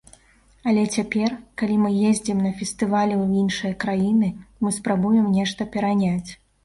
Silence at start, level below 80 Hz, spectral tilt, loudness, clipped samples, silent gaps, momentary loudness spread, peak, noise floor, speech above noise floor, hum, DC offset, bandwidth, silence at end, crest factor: 0.65 s; -54 dBFS; -5.5 dB/octave; -22 LUFS; under 0.1%; none; 7 LU; -8 dBFS; -56 dBFS; 35 dB; none; under 0.1%; 11.5 kHz; 0.3 s; 14 dB